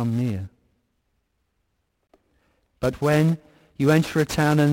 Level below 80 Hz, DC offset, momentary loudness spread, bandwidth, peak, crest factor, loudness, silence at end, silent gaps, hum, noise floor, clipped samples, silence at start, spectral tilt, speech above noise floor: -52 dBFS; under 0.1%; 11 LU; 16.5 kHz; -8 dBFS; 16 dB; -22 LUFS; 0 s; none; none; -73 dBFS; under 0.1%; 0 s; -6.5 dB/octave; 53 dB